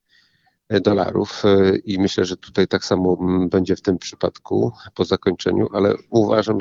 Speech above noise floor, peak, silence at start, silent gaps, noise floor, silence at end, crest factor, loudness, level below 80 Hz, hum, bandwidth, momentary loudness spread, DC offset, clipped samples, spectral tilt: 43 dB; -2 dBFS; 0.7 s; none; -62 dBFS; 0 s; 16 dB; -19 LUFS; -52 dBFS; none; 7.6 kHz; 6 LU; under 0.1%; under 0.1%; -6.5 dB/octave